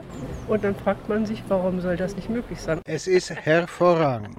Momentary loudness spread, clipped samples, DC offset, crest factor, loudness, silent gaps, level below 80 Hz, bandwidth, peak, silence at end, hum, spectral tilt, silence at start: 10 LU; under 0.1%; under 0.1%; 16 dB; -24 LUFS; none; -46 dBFS; 14.5 kHz; -8 dBFS; 0 s; none; -6 dB/octave; 0 s